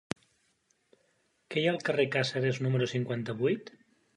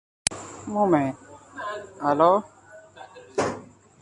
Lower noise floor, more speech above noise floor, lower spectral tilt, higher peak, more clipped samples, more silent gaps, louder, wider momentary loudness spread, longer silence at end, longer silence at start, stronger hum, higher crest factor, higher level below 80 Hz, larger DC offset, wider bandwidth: first, -73 dBFS vs -47 dBFS; first, 43 dB vs 26 dB; first, -6 dB/octave vs -4.5 dB/octave; second, -12 dBFS vs -2 dBFS; neither; neither; second, -31 LUFS vs -25 LUFS; second, 8 LU vs 25 LU; about the same, 0.45 s vs 0.35 s; first, 1.5 s vs 0.3 s; neither; about the same, 22 dB vs 24 dB; second, -72 dBFS vs -60 dBFS; neither; about the same, 11 kHz vs 11.5 kHz